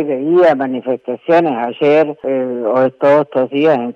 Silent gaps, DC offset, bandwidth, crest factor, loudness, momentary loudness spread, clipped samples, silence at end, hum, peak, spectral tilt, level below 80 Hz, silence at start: none; under 0.1%; 7.2 kHz; 10 dB; -14 LUFS; 7 LU; under 0.1%; 0.05 s; none; -4 dBFS; -8 dB/octave; -62 dBFS; 0 s